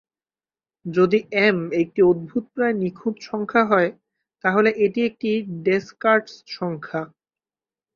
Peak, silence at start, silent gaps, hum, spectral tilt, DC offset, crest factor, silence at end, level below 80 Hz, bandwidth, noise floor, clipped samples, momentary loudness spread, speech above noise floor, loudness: -2 dBFS; 0.85 s; none; none; -7 dB/octave; under 0.1%; 20 dB; 0.9 s; -64 dBFS; 7 kHz; under -90 dBFS; under 0.1%; 11 LU; over 69 dB; -21 LUFS